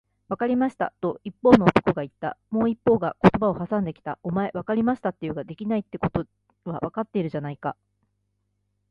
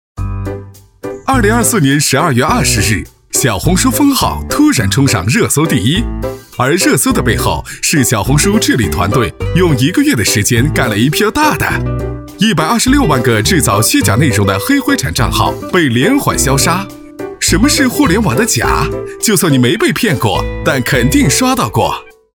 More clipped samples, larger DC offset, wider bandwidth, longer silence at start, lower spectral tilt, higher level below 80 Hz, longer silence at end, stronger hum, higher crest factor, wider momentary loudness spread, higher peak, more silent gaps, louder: neither; neither; second, 7.4 kHz vs over 20 kHz; first, 0.3 s vs 0.15 s; first, -8.5 dB/octave vs -4 dB/octave; second, -52 dBFS vs -26 dBFS; first, 1.2 s vs 0.25 s; first, 50 Hz at -50 dBFS vs none; first, 24 dB vs 12 dB; first, 14 LU vs 7 LU; about the same, 0 dBFS vs 0 dBFS; neither; second, -24 LUFS vs -11 LUFS